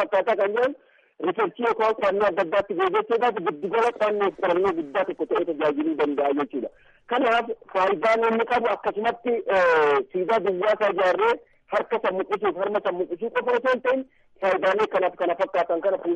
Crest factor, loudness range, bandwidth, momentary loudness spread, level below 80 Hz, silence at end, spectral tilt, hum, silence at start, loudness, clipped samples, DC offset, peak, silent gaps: 10 dB; 3 LU; 9 kHz; 7 LU; -64 dBFS; 0 s; -5.5 dB/octave; none; 0 s; -23 LUFS; under 0.1%; under 0.1%; -12 dBFS; none